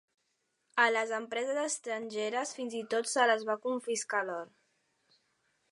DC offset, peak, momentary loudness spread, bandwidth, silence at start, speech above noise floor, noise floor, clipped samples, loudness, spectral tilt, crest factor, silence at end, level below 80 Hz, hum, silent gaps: under 0.1%; -12 dBFS; 9 LU; 11 kHz; 0.75 s; 47 dB; -79 dBFS; under 0.1%; -32 LUFS; -1.5 dB/octave; 22 dB; 1.25 s; under -90 dBFS; none; none